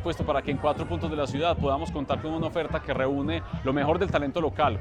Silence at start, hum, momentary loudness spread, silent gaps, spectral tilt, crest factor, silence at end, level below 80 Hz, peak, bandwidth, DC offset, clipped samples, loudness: 0 s; none; 5 LU; none; -7 dB/octave; 18 dB; 0 s; -42 dBFS; -10 dBFS; 10.5 kHz; under 0.1%; under 0.1%; -27 LUFS